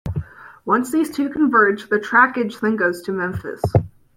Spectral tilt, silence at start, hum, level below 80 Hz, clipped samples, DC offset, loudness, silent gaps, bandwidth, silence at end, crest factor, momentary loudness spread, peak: -7 dB/octave; 0.05 s; none; -46 dBFS; under 0.1%; under 0.1%; -19 LUFS; none; 16.5 kHz; 0.3 s; 18 dB; 12 LU; -2 dBFS